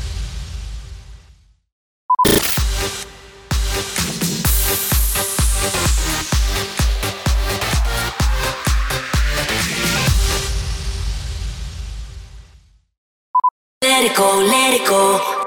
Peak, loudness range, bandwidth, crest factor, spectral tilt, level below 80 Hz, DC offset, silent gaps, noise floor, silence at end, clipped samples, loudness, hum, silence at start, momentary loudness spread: -2 dBFS; 5 LU; over 20 kHz; 16 dB; -3 dB/octave; -24 dBFS; under 0.1%; 1.72-2.09 s, 12.97-13.34 s, 13.51-13.81 s; -49 dBFS; 0 s; under 0.1%; -17 LUFS; none; 0 s; 17 LU